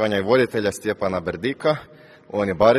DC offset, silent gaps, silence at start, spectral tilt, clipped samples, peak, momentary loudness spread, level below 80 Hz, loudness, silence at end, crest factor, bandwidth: under 0.1%; none; 0 s; -5.5 dB/octave; under 0.1%; -2 dBFS; 8 LU; -52 dBFS; -22 LUFS; 0 s; 20 dB; 13 kHz